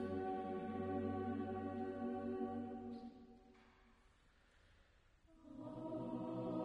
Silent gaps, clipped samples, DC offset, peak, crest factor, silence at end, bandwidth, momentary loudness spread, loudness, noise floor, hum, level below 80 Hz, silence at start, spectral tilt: none; under 0.1%; under 0.1%; -30 dBFS; 16 dB; 0 s; 8.8 kHz; 14 LU; -46 LUFS; -72 dBFS; none; -72 dBFS; 0 s; -9 dB/octave